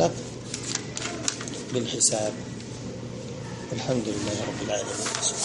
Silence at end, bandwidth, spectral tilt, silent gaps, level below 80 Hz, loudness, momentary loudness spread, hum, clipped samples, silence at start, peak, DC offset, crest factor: 0 s; 11.5 kHz; -3 dB/octave; none; -54 dBFS; -28 LUFS; 14 LU; none; under 0.1%; 0 s; -4 dBFS; under 0.1%; 24 dB